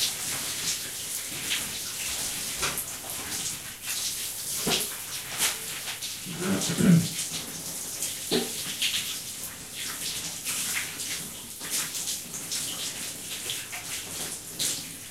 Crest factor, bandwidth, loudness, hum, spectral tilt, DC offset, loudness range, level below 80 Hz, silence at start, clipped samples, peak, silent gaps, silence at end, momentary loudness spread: 22 dB; 16 kHz; -29 LUFS; none; -2.5 dB/octave; under 0.1%; 4 LU; -58 dBFS; 0 s; under 0.1%; -8 dBFS; none; 0 s; 7 LU